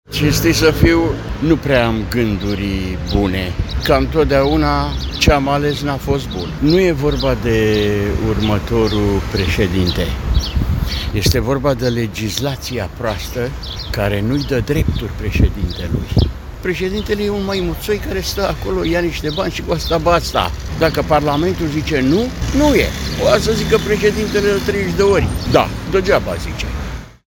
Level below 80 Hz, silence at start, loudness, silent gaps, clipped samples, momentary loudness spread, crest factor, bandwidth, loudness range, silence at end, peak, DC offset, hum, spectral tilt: -24 dBFS; 0.1 s; -17 LUFS; none; under 0.1%; 8 LU; 16 dB; 17 kHz; 4 LU; 0.15 s; 0 dBFS; under 0.1%; none; -5.5 dB/octave